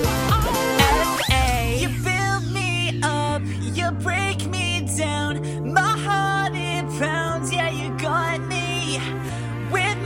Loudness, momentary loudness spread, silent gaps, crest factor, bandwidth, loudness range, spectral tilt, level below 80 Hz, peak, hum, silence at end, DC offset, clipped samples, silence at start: -22 LUFS; 6 LU; none; 22 dB; 16.5 kHz; 3 LU; -4.5 dB/octave; -34 dBFS; 0 dBFS; none; 0 s; under 0.1%; under 0.1%; 0 s